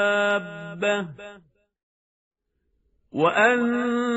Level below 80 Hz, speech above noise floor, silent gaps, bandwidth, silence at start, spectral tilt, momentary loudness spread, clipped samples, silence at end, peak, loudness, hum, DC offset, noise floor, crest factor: -66 dBFS; 50 dB; 1.83-2.31 s; 8 kHz; 0 s; -3 dB/octave; 18 LU; under 0.1%; 0 s; -6 dBFS; -22 LUFS; none; under 0.1%; -73 dBFS; 20 dB